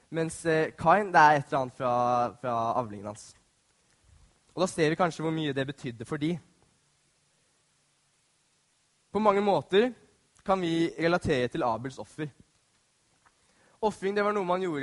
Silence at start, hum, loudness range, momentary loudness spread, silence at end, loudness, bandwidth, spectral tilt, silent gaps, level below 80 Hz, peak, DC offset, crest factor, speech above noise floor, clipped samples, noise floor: 0.1 s; none; 9 LU; 15 LU; 0 s; -27 LUFS; 11.5 kHz; -5.5 dB/octave; none; -60 dBFS; -8 dBFS; under 0.1%; 22 dB; 43 dB; under 0.1%; -70 dBFS